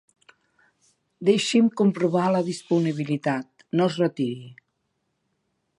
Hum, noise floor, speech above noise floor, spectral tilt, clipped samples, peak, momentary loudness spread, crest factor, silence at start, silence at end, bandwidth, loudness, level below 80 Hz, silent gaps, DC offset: none; -75 dBFS; 53 dB; -6 dB/octave; under 0.1%; -8 dBFS; 9 LU; 18 dB; 1.2 s; 1.25 s; 11.5 kHz; -23 LUFS; -74 dBFS; none; under 0.1%